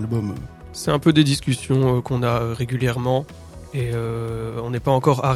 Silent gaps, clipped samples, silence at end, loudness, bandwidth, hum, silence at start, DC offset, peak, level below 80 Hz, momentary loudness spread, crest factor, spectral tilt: none; under 0.1%; 0 s; -21 LUFS; 13.5 kHz; none; 0 s; under 0.1%; -2 dBFS; -44 dBFS; 13 LU; 20 dB; -6.5 dB/octave